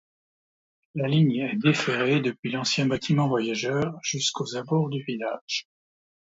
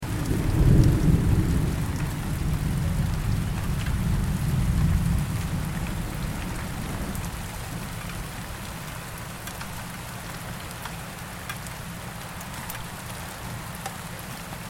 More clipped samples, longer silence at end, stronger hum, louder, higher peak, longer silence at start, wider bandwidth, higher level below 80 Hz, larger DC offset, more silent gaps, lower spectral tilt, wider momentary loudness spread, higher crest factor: neither; first, 0.8 s vs 0 s; neither; first, -25 LUFS vs -28 LUFS; about the same, -6 dBFS vs -4 dBFS; first, 0.95 s vs 0 s; second, 8 kHz vs 17 kHz; second, -64 dBFS vs -32 dBFS; neither; first, 2.39-2.43 s, 5.41-5.48 s vs none; about the same, -5 dB/octave vs -6 dB/octave; second, 8 LU vs 13 LU; about the same, 20 dB vs 22 dB